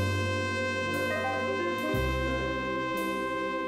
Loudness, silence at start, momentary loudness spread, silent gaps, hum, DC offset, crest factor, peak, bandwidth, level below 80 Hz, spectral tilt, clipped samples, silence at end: -30 LUFS; 0 s; 2 LU; none; none; under 0.1%; 12 dB; -18 dBFS; 16 kHz; -44 dBFS; -5.5 dB/octave; under 0.1%; 0 s